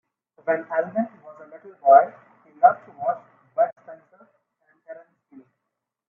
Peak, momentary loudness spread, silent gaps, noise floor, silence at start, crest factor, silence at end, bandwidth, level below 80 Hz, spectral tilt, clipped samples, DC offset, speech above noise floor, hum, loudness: -2 dBFS; 28 LU; 3.72-3.76 s; -82 dBFS; 0.45 s; 22 dB; 1.15 s; 2.7 kHz; -80 dBFS; -9.5 dB/octave; under 0.1%; under 0.1%; 62 dB; none; -22 LUFS